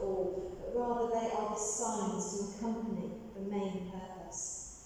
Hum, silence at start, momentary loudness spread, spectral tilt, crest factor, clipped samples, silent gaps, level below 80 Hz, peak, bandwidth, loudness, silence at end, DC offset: none; 0 s; 9 LU; -4.5 dB/octave; 14 dB; under 0.1%; none; -58 dBFS; -22 dBFS; 15.5 kHz; -37 LUFS; 0 s; under 0.1%